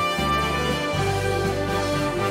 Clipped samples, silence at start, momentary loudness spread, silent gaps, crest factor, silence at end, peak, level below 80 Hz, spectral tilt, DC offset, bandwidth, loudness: under 0.1%; 0 s; 2 LU; none; 14 dB; 0 s; -10 dBFS; -38 dBFS; -5 dB/octave; under 0.1%; 16 kHz; -23 LUFS